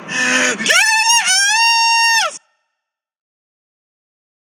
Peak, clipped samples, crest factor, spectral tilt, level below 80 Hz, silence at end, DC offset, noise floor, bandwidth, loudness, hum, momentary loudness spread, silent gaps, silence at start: 0 dBFS; under 0.1%; 16 dB; 1 dB/octave; -82 dBFS; 2.05 s; under 0.1%; -78 dBFS; over 20 kHz; -11 LUFS; none; 5 LU; none; 0 s